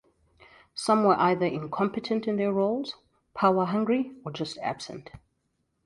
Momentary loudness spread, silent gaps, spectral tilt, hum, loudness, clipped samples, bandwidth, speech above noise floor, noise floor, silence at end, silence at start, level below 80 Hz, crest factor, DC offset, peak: 17 LU; none; -6 dB/octave; none; -27 LUFS; under 0.1%; 11.5 kHz; 49 dB; -75 dBFS; 0.65 s; 0.75 s; -66 dBFS; 20 dB; under 0.1%; -8 dBFS